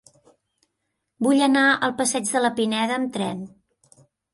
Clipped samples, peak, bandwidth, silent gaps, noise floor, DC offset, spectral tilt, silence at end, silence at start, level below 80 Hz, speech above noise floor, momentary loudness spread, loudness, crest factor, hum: under 0.1%; -6 dBFS; 11.5 kHz; none; -78 dBFS; under 0.1%; -3 dB/octave; 0.85 s; 1.2 s; -68 dBFS; 57 dB; 11 LU; -21 LUFS; 18 dB; none